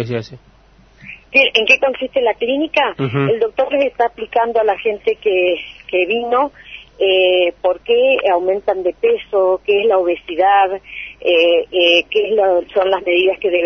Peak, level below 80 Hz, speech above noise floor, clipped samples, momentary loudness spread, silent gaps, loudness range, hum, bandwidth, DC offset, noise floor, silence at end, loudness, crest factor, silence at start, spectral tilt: 0 dBFS; -52 dBFS; 30 dB; under 0.1%; 8 LU; none; 3 LU; none; 6.4 kHz; under 0.1%; -45 dBFS; 0 s; -15 LUFS; 16 dB; 0 s; -5.5 dB/octave